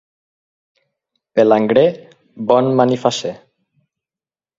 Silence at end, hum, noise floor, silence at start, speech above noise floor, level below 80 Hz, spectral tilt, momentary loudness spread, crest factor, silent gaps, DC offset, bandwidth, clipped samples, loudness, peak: 1.2 s; none; under -90 dBFS; 1.35 s; over 76 dB; -62 dBFS; -6 dB/octave; 13 LU; 18 dB; none; under 0.1%; 7.8 kHz; under 0.1%; -15 LUFS; 0 dBFS